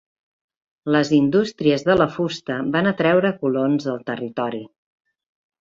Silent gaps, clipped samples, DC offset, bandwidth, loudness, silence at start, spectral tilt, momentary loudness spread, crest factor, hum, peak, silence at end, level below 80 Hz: none; under 0.1%; under 0.1%; 7.6 kHz; -20 LUFS; 0.85 s; -6.5 dB/octave; 10 LU; 18 dB; none; -4 dBFS; 0.95 s; -56 dBFS